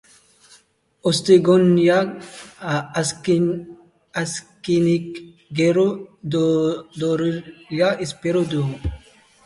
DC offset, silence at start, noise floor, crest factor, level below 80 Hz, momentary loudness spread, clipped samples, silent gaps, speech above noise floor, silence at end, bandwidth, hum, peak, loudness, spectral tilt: under 0.1%; 1.05 s; -57 dBFS; 18 dB; -46 dBFS; 16 LU; under 0.1%; none; 37 dB; 0.5 s; 11.5 kHz; none; -2 dBFS; -20 LUFS; -6 dB/octave